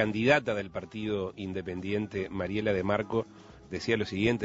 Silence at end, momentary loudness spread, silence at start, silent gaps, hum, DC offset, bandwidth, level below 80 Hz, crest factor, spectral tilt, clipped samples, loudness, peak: 0 s; 11 LU; 0 s; none; none; under 0.1%; 8 kHz; -56 dBFS; 22 dB; -6.5 dB/octave; under 0.1%; -31 LUFS; -10 dBFS